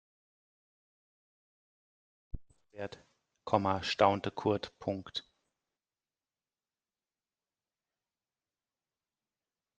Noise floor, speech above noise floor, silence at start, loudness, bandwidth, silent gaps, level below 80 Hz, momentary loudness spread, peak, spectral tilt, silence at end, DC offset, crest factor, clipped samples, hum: under -90 dBFS; over 57 dB; 2.35 s; -33 LUFS; 9 kHz; none; -60 dBFS; 23 LU; -10 dBFS; -5.5 dB/octave; 4.6 s; under 0.1%; 30 dB; under 0.1%; none